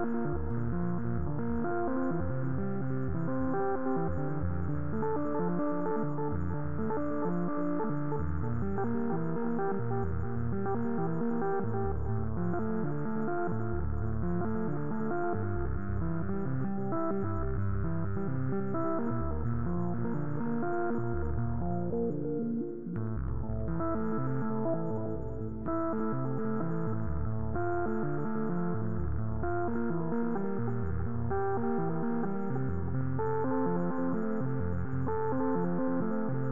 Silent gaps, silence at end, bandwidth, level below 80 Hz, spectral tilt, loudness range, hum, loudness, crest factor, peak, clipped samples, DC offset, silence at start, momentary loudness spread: none; 0 s; 2.9 kHz; -46 dBFS; -12.5 dB/octave; 1 LU; none; -33 LUFS; 12 dB; -18 dBFS; under 0.1%; 2%; 0 s; 3 LU